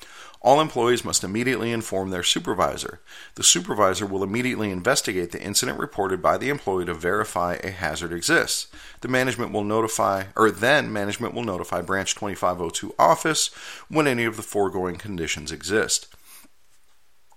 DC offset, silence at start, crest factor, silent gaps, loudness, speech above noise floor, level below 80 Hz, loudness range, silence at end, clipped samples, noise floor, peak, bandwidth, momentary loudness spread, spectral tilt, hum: 0.3%; 0 s; 22 dB; none; -23 LUFS; 41 dB; -54 dBFS; 2 LU; 0.95 s; under 0.1%; -64 dBFS; -2 dBFS; 16.5 kHz; 9 LU; -3 dB/octave; none